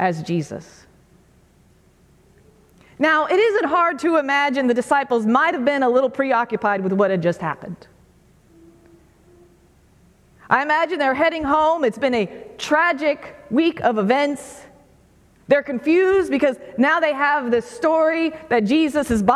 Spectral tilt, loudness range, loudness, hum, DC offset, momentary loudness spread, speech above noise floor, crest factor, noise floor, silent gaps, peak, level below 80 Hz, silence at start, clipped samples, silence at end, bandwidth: -5.5 dB/octave; 7 LU; -19 LUFS; none; under 0.1%; 8 LU; 36 dB; 18 dB; -55 dBFS; none; -2 dBFS; -54 dBFS; 0 s; under 0.1%; 0 s; 13.5 kHz